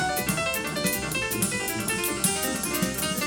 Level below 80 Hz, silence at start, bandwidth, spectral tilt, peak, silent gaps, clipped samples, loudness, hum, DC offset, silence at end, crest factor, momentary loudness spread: -48 dBFS; 0 s; over 20 kHz; -2.5 dB/octave; -8 dBFS; none; under 0.1%; -25 LUFS; none; under 0.1%; 0 s; 18 dB; 3 LU